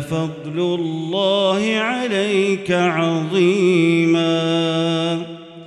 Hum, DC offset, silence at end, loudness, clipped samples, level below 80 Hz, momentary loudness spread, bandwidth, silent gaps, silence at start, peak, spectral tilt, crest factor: none; under 0.1%; 0 s; -18 LUFS; under 0.1%; -60 dBFS; 8 LU; 11 kHz; none; 0 s; -6 dBFS; -6 dB/octave; 12 dB